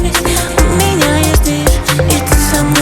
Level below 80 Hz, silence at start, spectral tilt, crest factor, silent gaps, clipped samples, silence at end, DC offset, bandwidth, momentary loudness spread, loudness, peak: -16 dBFS; 0 s; -4 dB/octave; 10 dB; none; under 0.1%; 0 s; under 0.1%; 19.5 kHz; 2 LU; -11 LUFS; 0 dBFS